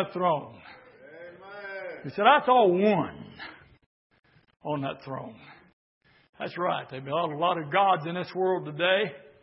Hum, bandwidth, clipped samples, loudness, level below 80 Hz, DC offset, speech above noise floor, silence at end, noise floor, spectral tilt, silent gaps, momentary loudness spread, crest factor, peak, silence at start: none; 5.8 kHz; under 0.1%; -26 LUFS; -72 dBFS; under 0.1%; 24 dB; 0.25 s; -50 dBFS; -9.5 dB/octave; 3.86-4.10 s, 5.73-6.01 s, 6.29-6.33 s; 23 LU; 22 dB; -6 dBFS; 0 s